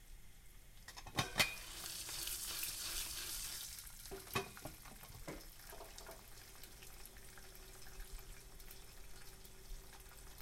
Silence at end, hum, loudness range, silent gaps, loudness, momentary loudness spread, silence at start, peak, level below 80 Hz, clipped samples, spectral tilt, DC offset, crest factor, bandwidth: 0 s; none; 15 LU; none; -44 LUFS; 16 LU; 0 s; -18 dBFS; -58 dBFS; under 0.1%; -1.5 dB/octave; under 0.1%; 30 dB; 16.5 kHz